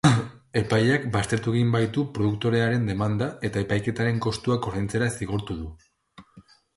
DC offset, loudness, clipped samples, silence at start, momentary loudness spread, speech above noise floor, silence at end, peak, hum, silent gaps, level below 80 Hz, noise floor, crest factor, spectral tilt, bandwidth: under 0.1%; -25 LUFS; under 0.1%; 0.05 s; 7 LU; 29 dB; 0.35 s; -4 dBFS; none; none; -48 dBFS; -54 dBFS; 20 dB; -6 dB/octave; 11.5 kHz